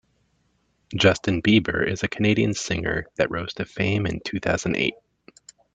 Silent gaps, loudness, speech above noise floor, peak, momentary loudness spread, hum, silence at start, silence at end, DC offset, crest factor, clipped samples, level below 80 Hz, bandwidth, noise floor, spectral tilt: none; -23 LUFS; 45 dB; -2 dBFS; 8 LU; none; 0.9 s; 0.8 s; under 0.1%; 22 dB; under 0.1%; -48 dBFS; 9 kHz; -68 dBFS; -5 dB/octave